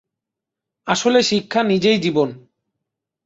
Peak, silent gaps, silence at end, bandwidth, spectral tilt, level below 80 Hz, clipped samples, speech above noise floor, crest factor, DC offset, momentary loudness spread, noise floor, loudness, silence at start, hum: -2 dBFS; none; 0.85 s; 8 kHz; -4.5 dB/octave; -60 dBFS; under 0.1%; 67 dB; 18 dB; under 0.1%; 7 LU; -84 dBFS; -18 LUFS; 0.85 s; none